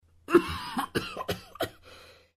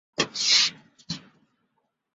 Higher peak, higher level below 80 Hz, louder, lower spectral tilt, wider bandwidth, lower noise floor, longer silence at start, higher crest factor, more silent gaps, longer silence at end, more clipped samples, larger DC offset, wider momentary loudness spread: about the same, -8 dBFS vs -6 dBFS; first, -54 dBFS vs -68 dBFS; second, -30 LUFS vs -21 LUFS; first, -5 dB/octave vs -0.5 dB/octave; first, 15.5 kHz vs 8.4 kHz; second, -53 dBFS vs -75 dBFS; about the same, 0.3 s vs 0.2 s; about the same, 24 dB vs 22 dB; neither; second, 0.25 s vs 0.95 s; neither; neither; second, 14 LU vs 18 LU